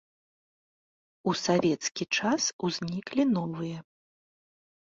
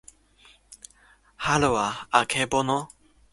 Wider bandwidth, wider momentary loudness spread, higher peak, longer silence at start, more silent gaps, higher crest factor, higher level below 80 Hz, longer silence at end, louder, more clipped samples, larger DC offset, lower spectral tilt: second, 7.8 kHz vs 11.5 kHz; second, 9 LU vs 24 LU; second, -12 dBFS vs -4 dBFS; first, 1.25 s vs 0.7 s; first, 2.53-2.59 s vs none; second, 18 dB vs 24 dB; second, -68 dBFS vs -52 dBFS; first, 1.05 s vs 0.45 s; second, -29 LUFS vs -24 LUFS; neither; neither; about the same, -4 dB/octave vs -3.5 dB/octave